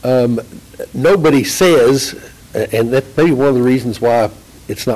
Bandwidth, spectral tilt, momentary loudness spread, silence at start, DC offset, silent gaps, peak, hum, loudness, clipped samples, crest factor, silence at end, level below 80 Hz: 16 kHz; -5.5 dB/octave; 14 LU; 0.05 s; under 0.1%; none; -4 dBFS; none; -13 LUFS; under 0.1%; 8 dB; 0 s; -44 dBFS